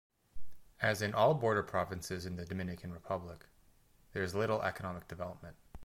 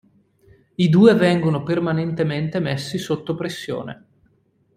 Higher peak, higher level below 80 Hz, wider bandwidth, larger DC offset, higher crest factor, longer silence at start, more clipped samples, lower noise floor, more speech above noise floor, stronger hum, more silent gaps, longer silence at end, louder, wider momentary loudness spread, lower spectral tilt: second, -16 dBFS vs -2 dBFS; about the same, -60 dBFS vs -56 dBFS; about the same, 16.5 kHz vs 15 kHz; neither; about the same, 20 dB vs 18 dB; second, 0.35 s vs 0.8 s; neither; first, -66 dBFS vs -62 dBFS; second, 30 dB vs 43 dB; neither; neither; second, 0 s vs 0.8 s; second, -36 LUFS vs -20 LUFS; about the same, 16 LU vs 15 LU; second, -5.5 dB/octave vs -7 dB/octave